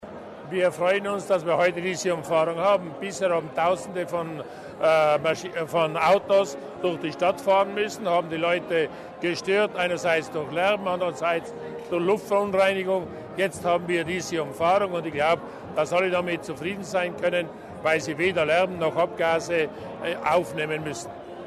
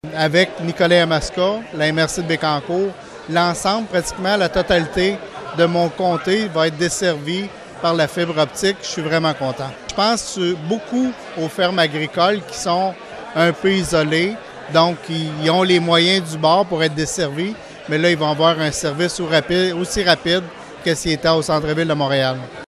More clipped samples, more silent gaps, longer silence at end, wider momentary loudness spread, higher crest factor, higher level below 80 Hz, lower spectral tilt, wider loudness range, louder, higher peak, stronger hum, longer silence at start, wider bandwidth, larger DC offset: neither; neither; about the same, 0 s vs 0 s; about the same, 9 LU vs 8 LU; about the same, 14 dB vs 18 dB; second, -62 dBFS vs -44 dBFS; about the same, -4.5 dB/octave vs -4.5 dB/octave; about the same, 2 LU vs 3 LU; second, -25 LUFS vs -18 LUFS; second, -10 dBFS vs 0 dBFS; neither; about the same, 0 s vs 0.05 s; about the same, 13.5 kHz vs 14 kHz; neither